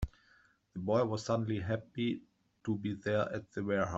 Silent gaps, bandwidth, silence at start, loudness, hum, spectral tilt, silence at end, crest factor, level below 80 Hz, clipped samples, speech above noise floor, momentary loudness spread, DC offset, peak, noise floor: none; 8 kHz; 0 s; -36 LUFS; none; -7 dB/octave; 0 s; 18 dB; -54 dBFS; under 0.1%; 34 dB; 11 LU; under 0.1%; -16 dBFS; -68 dBFS